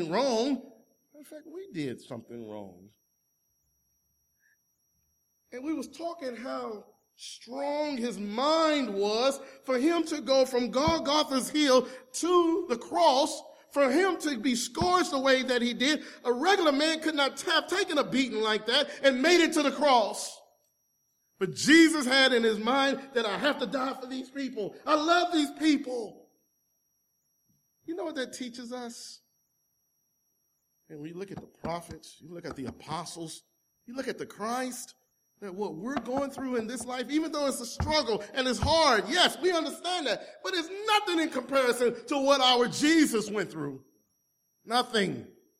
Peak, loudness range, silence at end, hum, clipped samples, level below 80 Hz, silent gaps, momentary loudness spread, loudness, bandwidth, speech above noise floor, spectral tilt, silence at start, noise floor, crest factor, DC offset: -8 dBFS; 16 LU; 0.35 s; none; under 0.1%; -58 dBFS; none; 18 LU; -27 LUFS; 16 kHz; 48 dB; -3.5 dB/octave; 0 s; -76 dBFS; 20 dB; under 0.1%